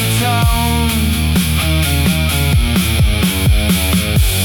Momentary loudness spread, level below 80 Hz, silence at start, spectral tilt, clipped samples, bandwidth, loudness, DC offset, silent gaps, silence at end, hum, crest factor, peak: 1 LU; -20 dBFS; 0 s; -4.5 dB/octave; under 0.1%; 19 kHz; -14 LUFS; under 0.1%; none; 0 s; none; 12 dB; -2 dBFS